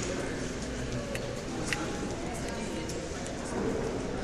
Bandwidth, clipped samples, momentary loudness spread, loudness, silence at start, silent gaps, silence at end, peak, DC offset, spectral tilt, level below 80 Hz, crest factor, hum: 14 kHz; under 0.1%; 4 LU; -35 LUFS; 0 s; none; 0 s; -10 dBFS; under 0.1%; -4.5 dB/octave; -44 dBFS; 24 dB; none